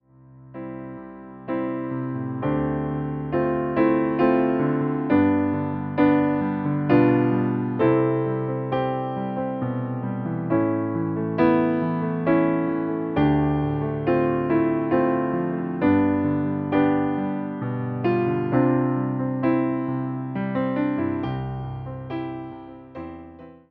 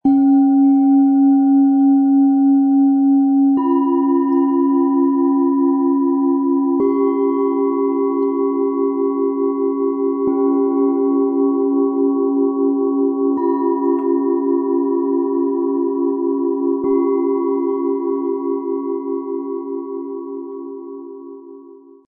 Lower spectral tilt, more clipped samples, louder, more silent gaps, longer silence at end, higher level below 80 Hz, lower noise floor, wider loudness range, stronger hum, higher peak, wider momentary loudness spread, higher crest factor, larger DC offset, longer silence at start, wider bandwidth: about the same, -11.5 dB/octave vs -11.5 dB/octave; neither; second, -23 LUFS vs -16 LUFS; neither; second, 0.15 s vs 0.3 s; first, -50 dBFS vs -68 dBFS; first, -48 dBFS vs -41 dBFS; about the same, 5 LU vs 7 LU; neither; about the same, -6 dBFS vs -6 dBFS; about the same, 12 LU vs 11 LU; first, 18 dB vs 10 dB; neither; first, 0.3 s vs 0.05 s; first, 4.7 kHz vs 2.2 kHz